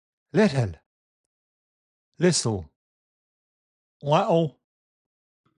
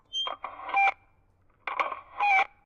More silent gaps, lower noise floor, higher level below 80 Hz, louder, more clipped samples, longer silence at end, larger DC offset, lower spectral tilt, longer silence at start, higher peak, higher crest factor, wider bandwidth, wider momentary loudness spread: first, 0.86-2.12 s, 2.76-4.00 s vs none; first, under -90 dBFS vs -64 dBFS; first, -54 dBFS vs -68 dBFS; first, -24 LUFS vs -27 LUFS; neither; first, 1.05 s vs 0.2 s; neither; first, -5 dB/octave vs 0 dB/octave; first, 0.35 s vs 0.15 s; first, -6 dBFS vs -14 dBFS; about the same, 20 dB vs 16 dB; first, 11 kHz vs 7.6 kHz; about the same, 10 LU vs 12 LU